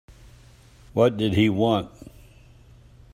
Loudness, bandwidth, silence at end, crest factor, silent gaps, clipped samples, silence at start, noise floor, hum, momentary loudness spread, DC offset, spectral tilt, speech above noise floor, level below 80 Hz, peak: -22 LUFS; 16 kHz; 1.25 s; 20 dB; none; under 0.1%; 0.95 s; -51 dBFS; none; 9 LU; under 0.1%; -7 dB/octave; 30 dB; -52 dBFS; -6 dBFS